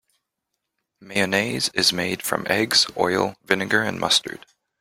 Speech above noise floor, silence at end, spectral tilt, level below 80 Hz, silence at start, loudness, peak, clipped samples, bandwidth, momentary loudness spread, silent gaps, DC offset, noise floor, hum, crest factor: 58 dB; 0.45 s; -2.5 dB/octave; -62 dBFS; 1 s; -21 LUFS; 0 dBFS; under 0.1%; 16.5 kHz; 7 LU; none; under 0.1%; -80 dBFS; none; 24 dB